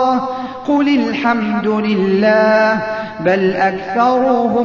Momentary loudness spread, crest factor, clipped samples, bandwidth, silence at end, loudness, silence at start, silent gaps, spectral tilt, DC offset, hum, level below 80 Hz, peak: 7 LU; 12 dB; under 0.1%; 7.2 kHz; 0 s; -15 LUFS; 0 s; none; -7 dB/octave; under 0.1%; none; -52 dBFS; -2 dBFS